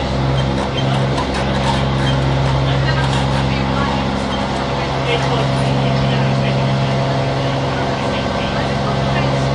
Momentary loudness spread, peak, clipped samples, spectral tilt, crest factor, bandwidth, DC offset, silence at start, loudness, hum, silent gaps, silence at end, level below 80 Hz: 3 LU; -4 dBFS; under 0.1%; -6 dB/octave; 12 dB; 10.5 kHz; under 0.1%; 0 s; -17 LUFS; none; none; 0 s; -28 dBFS